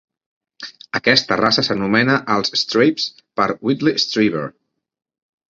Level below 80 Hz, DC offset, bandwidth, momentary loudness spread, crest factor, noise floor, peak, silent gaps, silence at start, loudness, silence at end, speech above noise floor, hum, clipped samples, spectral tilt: -56 dBFS; under 0.1%; 7.6 kHz; 12 LU; 20 dB; -38 dBFS; 0 dBFS; none; 0.6 s; -17 LUFS; 1 s; 21 dB; none; under 0.1%; -4.5 dB/octave